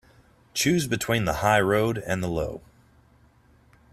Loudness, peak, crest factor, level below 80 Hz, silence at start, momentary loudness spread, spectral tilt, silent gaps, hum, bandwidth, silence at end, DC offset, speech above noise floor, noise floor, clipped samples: -24 LUFS; -6 dBFS; 20 dB; -48 dBFS; 0.55 s; 11 LU; -4.5 dB/octave; none; none; 15.5 kHz; 1.35 s; under 0.1%; 34 dB; -58 dBFS; under 0.1%